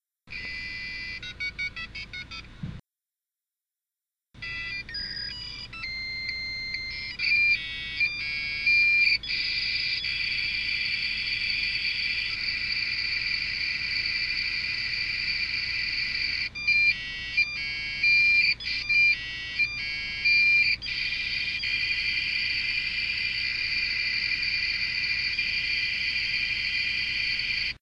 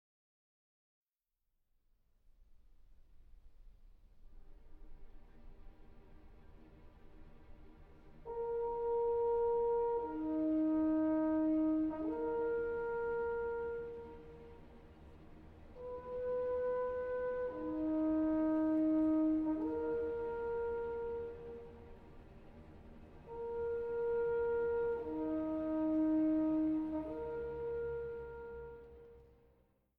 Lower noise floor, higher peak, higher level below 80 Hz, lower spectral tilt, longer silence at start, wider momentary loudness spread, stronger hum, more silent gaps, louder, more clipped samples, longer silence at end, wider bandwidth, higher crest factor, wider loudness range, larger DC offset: about the same, under -90 dBFS vs -88 dBFS; first, -12 dBFS vs -26 dBFS; first, -50 dBFS vs -60 dBFS; second, -1.5 dB/octave vs -10 dB/octave; second, 0.25 s vs 2.4 s; second, 13 LU vs 22 LU; neither; neither; first, -25 LUFS vs -37 LUFS; neither; second, 0.05 s vs 0.75 s; first, 10 kHz vs 3.9 kHz; about the same, 16 dB vs 12 dB; first, 13 LU vs 9 LU; neither